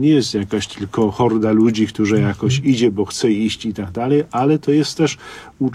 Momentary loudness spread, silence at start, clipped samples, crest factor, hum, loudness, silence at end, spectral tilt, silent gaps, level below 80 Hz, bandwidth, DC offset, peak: 8 LU; 0 s; under 0.1%; 14 dB; none; -17 LUFS; 0 s; -6 dB/octave; none; -50 dBFS; 12.5 kHz; under 0.1%; -4 dBFS